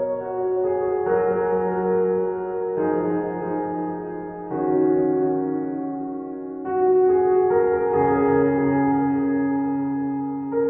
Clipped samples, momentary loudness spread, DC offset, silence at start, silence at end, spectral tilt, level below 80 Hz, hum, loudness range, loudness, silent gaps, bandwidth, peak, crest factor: under 0.1%; 10 LU; under 0.1%; 0 s; 0 s; -9.5 dB/octave; -54 dBFS; none; 5 LU; -22 LUFS; none; 3 kHz; -8 dBFS; 14 dB